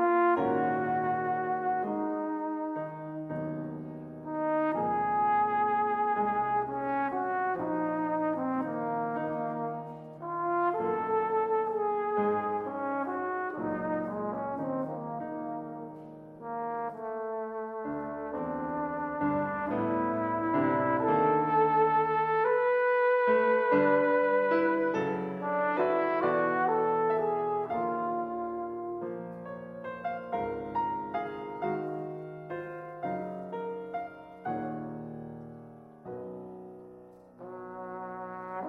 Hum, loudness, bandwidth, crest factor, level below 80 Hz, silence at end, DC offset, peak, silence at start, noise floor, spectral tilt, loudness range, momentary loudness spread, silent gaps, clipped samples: none; -30 LUFS; 6.2 kHz; 18 dB; -66 dBFS; 0 s; under 0.1%; -12 dBFS; 0 s; -52 dBFS; -9 dB/octave; 12 LU; 16 LU; none; under 0.1%